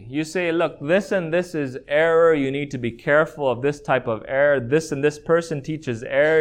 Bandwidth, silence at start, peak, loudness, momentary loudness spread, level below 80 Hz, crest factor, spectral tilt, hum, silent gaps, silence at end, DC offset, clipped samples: 13 kHz; 0 s; -6 dBFS; -21 LUFS; 9 LU; -54 dBFS; 16 dB; -6 dB/octave; none; none; 0 s; under 0.1%; under 0.1%